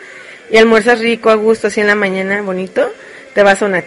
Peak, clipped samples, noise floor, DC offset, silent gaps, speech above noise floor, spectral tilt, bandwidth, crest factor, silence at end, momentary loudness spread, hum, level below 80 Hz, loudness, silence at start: 0 dBFS; 0.2%; -34 dBFS; under 0.1%; none; 22 dB; -4.5 dB/octave; 11.5 kHz; 12 dB; 0 s; 9 LU; none; -50 dBFS; -12 LUFS; 0 s